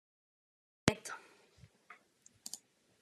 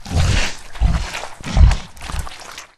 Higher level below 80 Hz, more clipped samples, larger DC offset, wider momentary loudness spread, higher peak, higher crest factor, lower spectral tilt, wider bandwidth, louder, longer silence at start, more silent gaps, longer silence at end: second, -68 dBFS vs -20 dBFS; neither; neither; first, 24 LU vs 14 LU; second, -6 dBFS vs 0 dBFS; first, 38 dB vs 18 dB; about the same, -4 dB/octave vs -4.5 dB/octave; about the same, 13.5 kHz vs 13 kHz; second, -40 LUFS vs -20 LUFS; first, 0.85 s vs 0 s; neither; first, 0.45 s vs 0.1 s